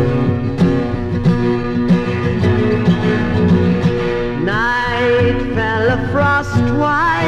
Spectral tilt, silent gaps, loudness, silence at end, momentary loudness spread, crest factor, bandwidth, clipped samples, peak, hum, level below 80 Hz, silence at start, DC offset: -7.5 dB/octave; none; -15 LUFS; 0 s; 4 LU; 12 dB; 8.6 kHz; under 0.1%; -4 dBFS; none; -30 dBFS; 0 s; under 0.1%